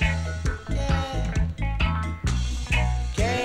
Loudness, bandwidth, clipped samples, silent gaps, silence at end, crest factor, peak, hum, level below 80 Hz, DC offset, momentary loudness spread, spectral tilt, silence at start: -27 LUFS; 11.5 kHz; under 0.1%; none; 0 s; 16 dB; -8 dBFS; none; -28 dBFS; under 0.1%; 4 LU; -5.5 dB/octave; 0 s